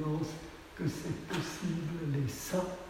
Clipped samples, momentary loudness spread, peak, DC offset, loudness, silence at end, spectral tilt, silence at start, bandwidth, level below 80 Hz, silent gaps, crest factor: under 0.1%; 6 LU; -20 dBFS; under 0.1%; -37 LUFS; 0 s; -6 dB/octave; 0 s; 16 kHz; -56 dBFS; none; 16 dB